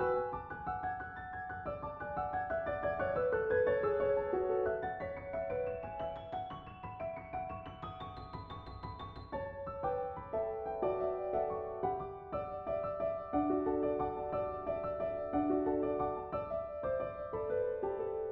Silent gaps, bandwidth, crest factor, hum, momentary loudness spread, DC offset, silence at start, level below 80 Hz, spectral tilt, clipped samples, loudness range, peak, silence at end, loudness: none; 5.2 kHz; 16 dB; none; 11 LU; under 0.1%; 0 s; -58 dBFS; -6 dB/octave; under 0.1%; 8 LU; -20 dBFS; 0 s; -37 LUFS